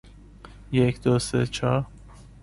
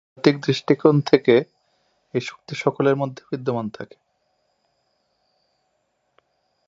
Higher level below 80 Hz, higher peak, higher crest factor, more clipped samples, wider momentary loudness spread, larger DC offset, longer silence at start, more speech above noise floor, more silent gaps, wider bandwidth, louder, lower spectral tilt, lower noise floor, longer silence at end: first, -46 dBFS vs -68 dBFS; second, -8 dBFS vs 0 dBFS; about the same, 18 dB vs 22 dB; neither; second, 6 LU vs 16 LU; neither; second, 0.05 s vs 0.25 s; second, 24 dB vs 51 dB; neither; first, 11.5 kHz vs 7.8 kHz; second, -24 LUFS vs -21 LUFS; about the same, -6 dB/octave vs -7 dB/octave; second, -46 dBFS vs -71 dBFS; second, 0.2 s vs 2.85 s